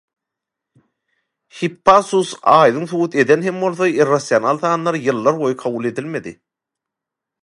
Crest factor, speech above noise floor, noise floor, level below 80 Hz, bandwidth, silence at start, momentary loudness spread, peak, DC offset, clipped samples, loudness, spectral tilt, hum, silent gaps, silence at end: 18 dB; 68 dB; -84 dBFS; -60 dBFS; 11.5 kHz; 1.55 s; 12 LU; 0 dBFS; under 0.1%; under 0.1%; -16 LUFS; -5.5 dB/octave; none; none; 1.1 s